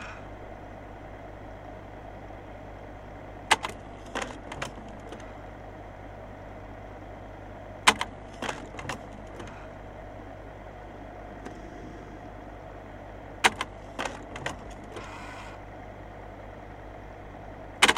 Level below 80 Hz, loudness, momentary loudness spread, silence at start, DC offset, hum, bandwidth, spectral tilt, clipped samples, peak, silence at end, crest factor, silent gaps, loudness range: -50 dBFS; -35 LUFS; 18 LU; 0 s; under 0.1%; 50 Hz at -50 dBFS; 16 kHz; -2.5 dB/octave; under 0.1%; 0 dBFS; 0 s; 34 dB; none; 12 LU